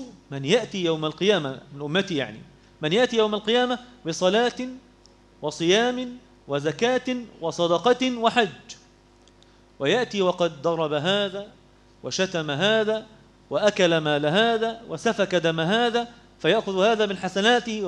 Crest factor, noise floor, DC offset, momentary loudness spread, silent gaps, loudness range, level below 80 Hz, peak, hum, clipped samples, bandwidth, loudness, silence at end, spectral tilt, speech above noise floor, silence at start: 20 dB; -55 dBFS; under 0.1%; 12 LU; none; 3 LU; -60 dBFS; -4 dBFS; none; under 0.1%; 10.5 kHz; -23 LUFS; 0 s; -4.5 dB/octave; 32 dB; 0 s